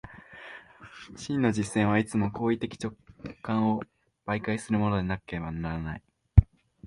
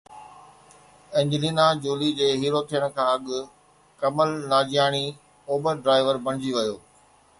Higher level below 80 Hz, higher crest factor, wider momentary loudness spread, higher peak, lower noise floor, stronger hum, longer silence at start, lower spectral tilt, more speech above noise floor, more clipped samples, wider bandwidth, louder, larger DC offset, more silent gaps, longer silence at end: first, -38 dBFS vs -64 dBFS; first, 26 dB vs 18 dB; first, 22 LU vs 10 LU; first, -2 dBFS vs -6 dBFS; second, -48 dBFS vs -57 dBFS; neither; about the same, 0.05 s vs 0.1 s; first, -7 dB/octave vs -5 dB/octave; second, 19 dB vs 34 dB; neither; about the same, 11.5 kHz vs 11.5 kHz; second, -28 LUFS vs -24 LUFS; neither; neither; second, 0 s vs 0.6 s